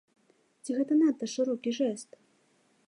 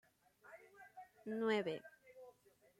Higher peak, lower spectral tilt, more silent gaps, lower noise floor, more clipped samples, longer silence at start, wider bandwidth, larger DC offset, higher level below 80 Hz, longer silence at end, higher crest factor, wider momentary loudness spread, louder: first, -16 dBFS vs -24 dBFS; second, -4.5 dB/octave vs -6 dB/octave; neither; about the same, -68 dBFS vs -70 dBFS; neither; first, 0.65 s vs 0.45 s; second, 11 kHz vs 15.5 kHz; neither; about the same, -88 dBFS vs under -90 dBFS; first, 0.85 s vs 0.5 s; second, 14 dB vs 22 dB; second, 18 LU vs 23 LU; first, -29 LUFS vs -42 LUFS